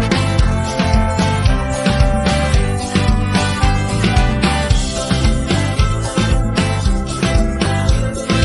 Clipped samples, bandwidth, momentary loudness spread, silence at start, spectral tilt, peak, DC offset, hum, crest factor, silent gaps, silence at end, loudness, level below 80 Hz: under 0.1%; 11.5 kHz; 3 LU; 0 s; -5.5 dB/octave; 0 dBFS; under 0.1%; none; 14 dB; none; 0 s; -16 LUFS; -20 dBFS